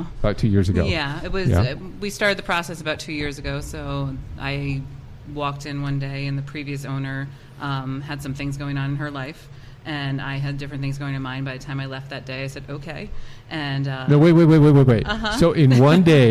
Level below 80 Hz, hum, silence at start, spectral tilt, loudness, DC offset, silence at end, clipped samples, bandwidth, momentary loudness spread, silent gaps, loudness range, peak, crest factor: -38 dBFS; none; 0 s; -7 dB/octave; -21 LUFS; under 0.1%; 0 s; under 0.1%; 12.5 kHz; 19 LU; none; 11 LU; -4 dBFS; 16 dB